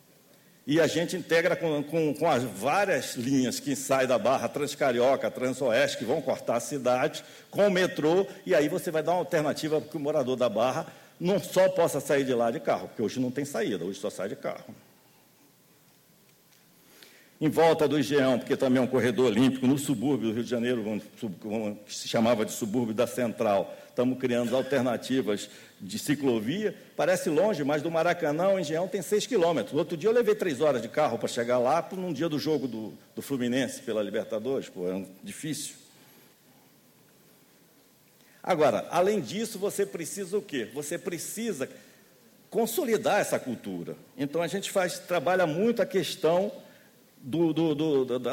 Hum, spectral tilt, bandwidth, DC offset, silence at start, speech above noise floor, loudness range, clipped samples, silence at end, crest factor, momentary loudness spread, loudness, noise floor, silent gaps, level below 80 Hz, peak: none; -5 dB/octave; 17 kHz; under 0.1%; 0.65 s; 33 dB; 7 LU; under 0.1%; 0 s; 16 dB; 10 LU; -28 LUFS; -61 dBFS; none; -70 dBFS; -12 dBFS